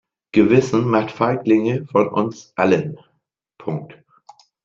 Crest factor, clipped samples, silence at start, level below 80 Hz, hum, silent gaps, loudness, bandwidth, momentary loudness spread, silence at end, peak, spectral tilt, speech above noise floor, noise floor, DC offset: 18 dB; under 0.1%; 0.35 s; -56 dBFS; none; none; -18 LUFS; 7.6 kHz; 13 LU; 0.75 s; -2 dBFS; -7.5 dB/octave; 53 dB; -71 dBFS; under 0.1%